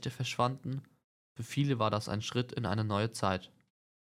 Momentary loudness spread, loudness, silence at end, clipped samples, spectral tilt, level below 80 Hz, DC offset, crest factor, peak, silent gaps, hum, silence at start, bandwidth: 10 LU; -34 LUFS; 0.6 s; under 0.1%; -5.5 dB/octave; -70 dBFS; under 0.1%; 20 dB; -14 dBFS; 1.04-1.35 s; none; 0 s; 15.5 kHz